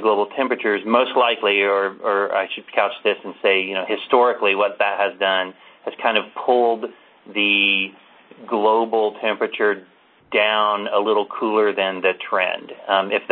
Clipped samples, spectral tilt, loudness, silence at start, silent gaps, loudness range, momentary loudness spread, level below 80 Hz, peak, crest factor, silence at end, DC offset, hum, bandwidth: under 0.1%; -8.5 dB/octave; -19 LUFS; 0 s; none; 1 LU; 7 LU; -70 dBFS; -2 dBFS; 18 dB; 0 s; under 0.1%; none; 4.4 kHz